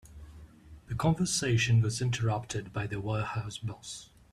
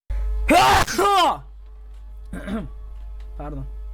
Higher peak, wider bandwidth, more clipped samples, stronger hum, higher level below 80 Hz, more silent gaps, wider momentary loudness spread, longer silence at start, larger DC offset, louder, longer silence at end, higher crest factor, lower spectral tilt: second, -14 dBFS vs -4 dBFS; second, 13 kHz vs 19 kHz; neither; neither; second, -54 dBFS vs -32 dBFS; neither; second, 16 LU vs 23 LU; about the same, 0.05 s vs 0.1 s; neither; second, -31 LUFS vs -19 LUFS; first, 0.3 s vs 0 s; about the same, 18 dB vs 18 dB; about the same, -5 dB/octave vs -4 dB/octave